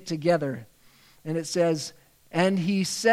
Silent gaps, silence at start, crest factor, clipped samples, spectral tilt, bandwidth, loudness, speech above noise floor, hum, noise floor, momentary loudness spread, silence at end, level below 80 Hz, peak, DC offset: none; 0 s; 18 dB; under 0.1%; -5 dB/octave; 16 kHz; -26 LUFS; 32 dB; none; -57 dBFS; 13 LU; 0 s; -68 dBFS; -8 dBFS; under 0.1%